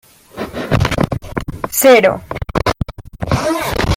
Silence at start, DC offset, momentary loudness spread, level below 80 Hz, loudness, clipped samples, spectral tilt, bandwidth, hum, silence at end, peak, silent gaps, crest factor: 0.35 s; under 0.1%; 17 LU; -30 dBFS; -15 LUFS; under 0.1%; -5 dB/octave; 16.5 kHz; none; 0 s; 0 dBFS; none; 16 dB